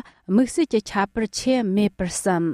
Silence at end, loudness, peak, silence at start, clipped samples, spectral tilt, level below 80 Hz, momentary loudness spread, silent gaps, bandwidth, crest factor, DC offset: 0 s; -22 LUFS; -8 dBFS; 0.3 s; under 0.1%; -5 dB/octave; -48 dBFS; 4 LU; none; 15 kHz; 14 dB; under 0.1%